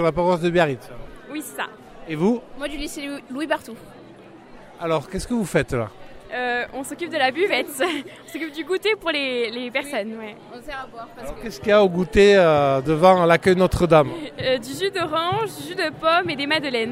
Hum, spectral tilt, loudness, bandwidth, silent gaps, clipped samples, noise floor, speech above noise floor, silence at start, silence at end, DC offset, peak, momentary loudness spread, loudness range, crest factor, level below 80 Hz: none; -5 dB/octave; -21 LUFS; 16 kHz; none; under 0.1%; -44 dBFS; 23 dB; 0 s; 0 s; under 0.1%; -2 dBFS; 18 LU; 11 LU; 20 dB; -42 dBFS